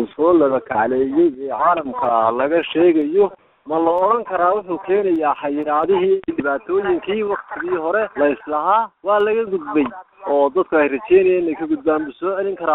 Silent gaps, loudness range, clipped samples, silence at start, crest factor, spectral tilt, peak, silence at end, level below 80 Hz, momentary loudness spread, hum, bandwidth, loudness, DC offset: none; 2 LU; under 0.1%; 0 s; 14 dB; -4 dB/octave; -2 dBFS; 0 s; -56 dBFS; 7 LU; none; 4 kHz; -18 LUFS; under 0.1%